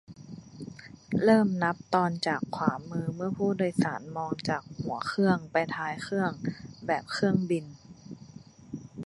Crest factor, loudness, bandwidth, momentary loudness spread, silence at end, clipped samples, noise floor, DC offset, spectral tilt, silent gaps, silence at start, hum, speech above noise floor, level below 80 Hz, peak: 22 dB; -29 LUFS; 11.5 kHz; 21 LU; 0 s; under 0.1%; -50 dBFS; under 0.1%; -6.5 dB/octave; none; 0.1 s; none; 22 dB; -64 dBFS; -8 dBFS